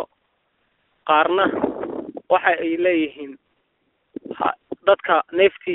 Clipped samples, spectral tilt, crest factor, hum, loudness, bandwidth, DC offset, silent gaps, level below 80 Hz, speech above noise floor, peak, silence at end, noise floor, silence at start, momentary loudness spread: under 0.1%; -1.5 dB/octave; 20 dB; none; -20 LUFS; 4.1 kHz; under 0.1%; none; -62 dBFS; 50 dB; 0 dBFS; 0 s; -69 dBFS; 0 s; 19 LU